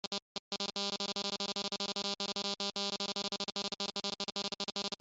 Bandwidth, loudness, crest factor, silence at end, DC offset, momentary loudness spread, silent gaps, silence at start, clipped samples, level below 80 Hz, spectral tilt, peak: 8.2 kHz; -36 LUFS; 20 dB; 0.05 s; under 0.1%; 2 LU; 0.07-0.11 s, 0.22-0.51 s; 0.05 s; under 0.1%; -76 dBFS; -2 dB/octave; -20 dBFS